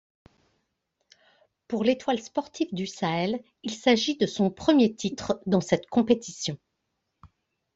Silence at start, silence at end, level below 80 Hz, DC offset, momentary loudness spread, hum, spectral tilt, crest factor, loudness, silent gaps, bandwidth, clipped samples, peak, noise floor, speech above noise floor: 1.7 s; 0.5 s; -64 dBFS; under 0.1%; 11 LU; none; -5 dB/octave; 20 dB; -26 LUFS; none; 8 kHz; under 0.1%; -6 dBFS; -79 dBFS; 54 dB